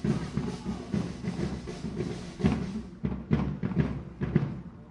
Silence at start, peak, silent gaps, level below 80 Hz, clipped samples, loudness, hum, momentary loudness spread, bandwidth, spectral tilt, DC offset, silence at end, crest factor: 0 s; -10 dBFS; none; -44 dBFS; under 0.1%; -32 LUFS; none; 7 LU; 11 kHz; -7.5 dB/octave; under 0.1%; 0 s; 20 dB